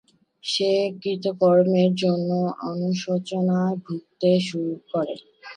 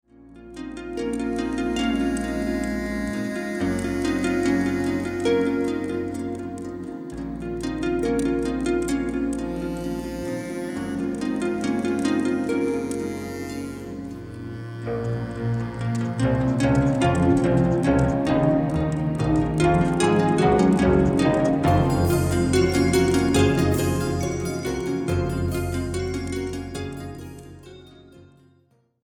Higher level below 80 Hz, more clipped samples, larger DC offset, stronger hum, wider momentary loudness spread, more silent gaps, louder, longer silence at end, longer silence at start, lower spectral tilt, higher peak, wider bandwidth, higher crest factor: second, -72 dBFS vs -38 dBFS; neither; neither; neither; about the same, 11 LU vs 13 LU; neither; about the same, -23 LUFS vs -23 LUFS; second, 0 s vs 0.8 s; first, 0.45 s vs 0.2 s; about the same, -6.5 dB/octave vs -6.5 dB/octave; about the same, -8 dBFS vs -6 dBFS; second, 10 kHz vs 18 kHz; about the same, 16 dB vs 18 dB